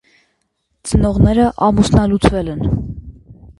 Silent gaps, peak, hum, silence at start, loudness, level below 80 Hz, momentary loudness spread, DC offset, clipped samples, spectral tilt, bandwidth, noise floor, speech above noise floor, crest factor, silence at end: none; 0 dBFS; none; 0.85 s; -15 LUFS; -26 dBFS; 14 LU; under 0.1%; under 0.1%; -7 dB/octave; 11.5 kHz; -68 dBFS; 54 dB; 16 dB; 0.15 s